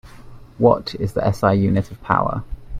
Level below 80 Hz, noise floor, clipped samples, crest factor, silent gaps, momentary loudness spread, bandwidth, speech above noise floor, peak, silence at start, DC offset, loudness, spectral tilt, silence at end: -38 dBFS; -39 dBFS; under 0.1%; 18 dB; none; 7 LU; 14.5 kHz; 21 dB; -2 dBFS; 0.05 s; under 0.1%; -19 LUFS; -8 dB/octave; 0 s